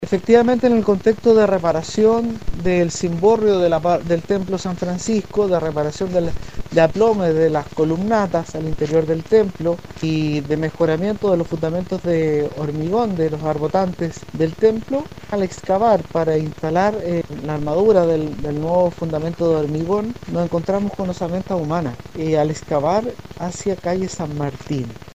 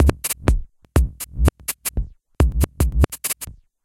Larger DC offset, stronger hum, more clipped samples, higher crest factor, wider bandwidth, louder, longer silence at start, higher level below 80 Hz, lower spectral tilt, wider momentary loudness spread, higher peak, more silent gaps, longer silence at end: first, 0.9% vs under 0.1%; neither; neither; about the same, 18 dB vs 20 dB; about the same, 15 kHz vs 16.5 kHz; first, -19 LUFS vs -22 LUFS; about the same, 0 s vs 0 s; second, -42 dBFS vs -22 dBFS; first, -7 dB/octave vs -5 dB/octave; about the same, 9 LU vs 8 LU; about the same, 0 dBFS vs -2 dBFS; neither; second, 0 s vs 0.3 s